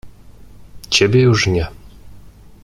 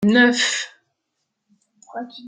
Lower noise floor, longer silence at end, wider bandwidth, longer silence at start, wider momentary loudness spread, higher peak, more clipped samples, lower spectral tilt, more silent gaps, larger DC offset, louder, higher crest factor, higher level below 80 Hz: second, -40 dBFS vs -77 dBFS; first, 0.35 s vs 0 s; first, 13 kHz vs 9.6 kHz; about the same, 0.05 s vs 0 s; second, 9 LU vs 20 LU; about the same, 0 dBFS vs -2 dBFS; neither; first, -5 dB/octave vs -3.5 dB/octave; neither; neither; first, -14 LUFS vs -17 LUFS; about the same, 18 dB vs 20 dB; first, -40 dBFS vs -68 dBFS